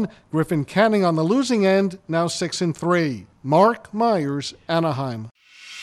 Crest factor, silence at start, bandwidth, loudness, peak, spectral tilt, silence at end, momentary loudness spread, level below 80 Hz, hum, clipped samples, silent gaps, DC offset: 18 dB; 0 s; 13 kHz; -21 LUFS; -4 dBFS; -6 dB/octave; 0 s; 11 LU; -60 dBFS; none; under 0.1%; 5.31-5.35 s; under 0.1%